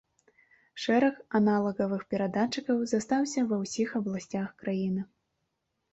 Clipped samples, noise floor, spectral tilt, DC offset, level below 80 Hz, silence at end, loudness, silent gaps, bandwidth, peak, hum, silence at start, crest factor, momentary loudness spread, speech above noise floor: under 0.1%; -80 dBFS; -5.5 dB/octave; under 0.1%; -70 dBFS; 0.9 s; -29 LUFS; none; 8.2 kHz; -14 dBFS; none; 0.75 s; 16 dB; 9 LU; 52 dB